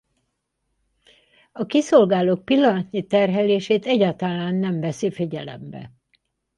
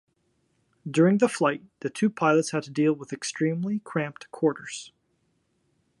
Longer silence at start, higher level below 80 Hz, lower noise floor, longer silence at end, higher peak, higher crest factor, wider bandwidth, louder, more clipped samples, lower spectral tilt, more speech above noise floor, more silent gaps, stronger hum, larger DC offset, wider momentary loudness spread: first, 1.55 s vs 0.85 s; first, -64 dBFS vs -74 dBFS; first, -75 dBFS vs -71 dBFS; second, 0.7 s vs 1.1 s; first, -4 dBFS vs -8 dBFS; about the same, 18 dB vs 20 dB; about the same, 11.5 kHz vs 11.5 kHz; first, -20 LUFS vs -26 LUFS; neither; about the same, -6.5 dB/octave vs -6 dB/octave; first, 55 dB vs 46 dB; neither; neither; neither; first, 16 LU vs 13 LU